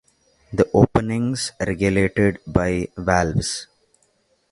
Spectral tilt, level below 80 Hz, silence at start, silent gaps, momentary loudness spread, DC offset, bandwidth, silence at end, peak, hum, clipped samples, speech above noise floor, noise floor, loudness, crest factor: -5.5 dB/octave; -38 dBFS; 0.5 s; none; 8 LU; under 0.1%; 11.5 kHz; 0.9 s; 0 dBFS; none; under 0.1%; 44 dB; -64 dBFS; -21 LUFS; 20 dB